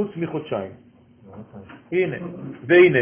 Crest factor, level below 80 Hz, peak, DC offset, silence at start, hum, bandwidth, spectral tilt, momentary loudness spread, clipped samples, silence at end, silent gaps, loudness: 18 dB; -60 dBFS; -4 dBFS; under 0.1%; 0 s; none; 3.6 kHz; -10.5 dB/octave; 27 LU; under 0.1%; 0 s; none; -21 LUFS